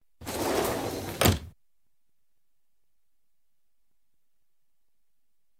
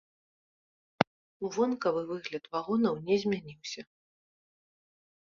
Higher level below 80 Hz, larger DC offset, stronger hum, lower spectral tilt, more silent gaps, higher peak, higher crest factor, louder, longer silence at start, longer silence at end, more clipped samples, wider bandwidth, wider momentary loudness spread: first, -50 dBFS vs -72 dBFS; neither; neither; second, -4 dB/octave vs -5.5 dB/octave; second, none vs 1.07-1.40 s; second, -6 dBFS vs -2 dBFS; about the same, 28 dB vs 32 dB; first, -28 LUFS vs -32 LUFS; second, 0.2 s vs 1 s; first, 4.1 s vs 1.5 s; neither; first, over 20 kHz vs 7.4 kHz; second, 9 LU vs 12 LU